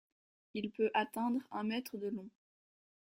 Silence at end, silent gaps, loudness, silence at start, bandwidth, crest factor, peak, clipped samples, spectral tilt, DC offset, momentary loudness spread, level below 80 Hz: 0.9 s; none; -38 LUFS; 0.55 s; 16 kHz; 20 dB; -20 dBFS; under 0.1%; -5.5 dB/octave; under 0.1%; 12 LU; -80 dBFS